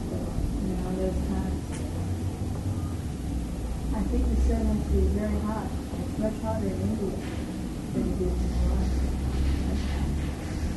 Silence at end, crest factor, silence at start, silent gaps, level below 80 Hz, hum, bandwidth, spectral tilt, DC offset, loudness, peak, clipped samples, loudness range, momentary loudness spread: 0 s; 12 dB; 0 s; none; -30 dBFS; none; 12 kHz; -7.5 dB/octave; under 0.1%; -29 LUFS; -14 dBFS; under 0.1%; 3 LU; 7 LU